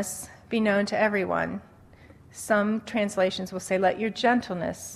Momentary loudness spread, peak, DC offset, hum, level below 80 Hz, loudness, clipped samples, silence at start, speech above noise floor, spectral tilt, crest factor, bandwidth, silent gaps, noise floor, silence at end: 9 LU; -10 dBFS; under 0.1%; none; -60 dBFS; -26 LUFS; under 0.1%; 0 s; 26 dB; -4.5 dB/octave; 16 dB; 14 kHz; none; -52 dBFS; 0 s